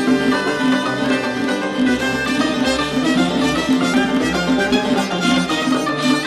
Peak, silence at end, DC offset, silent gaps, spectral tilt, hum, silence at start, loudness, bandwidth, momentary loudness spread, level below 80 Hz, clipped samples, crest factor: -4 dBFS; 0 s; under 0.1%; none; -4.5 dB/octave; none; 0 s; -17 LUFS; 13.5 kHz; 2 LU; -44 dBFS; under 0.1%; 14 dB